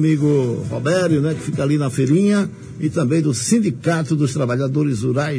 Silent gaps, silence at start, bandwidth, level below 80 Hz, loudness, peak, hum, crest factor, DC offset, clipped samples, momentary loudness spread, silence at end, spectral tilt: none; 0 s; 10.5 kHz; -54 dBFS; -18 LUFS; -4 dBFS; none; 14 dB; under 0.1%; under 0.1%; 6 LU; 0 s; -6.5 dB/octave